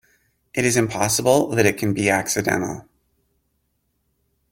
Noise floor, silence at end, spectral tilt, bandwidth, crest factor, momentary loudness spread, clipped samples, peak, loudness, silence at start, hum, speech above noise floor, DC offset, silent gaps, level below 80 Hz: -70 dBFS; 1.7 s; -4 dB/octave; 17 kHz; 22 dB; 10 LU; under 0.1%; -2 dBFS; -20 LUFS; 0.55 s; none; 51 dB; under 0.1%; none; -54 dBFS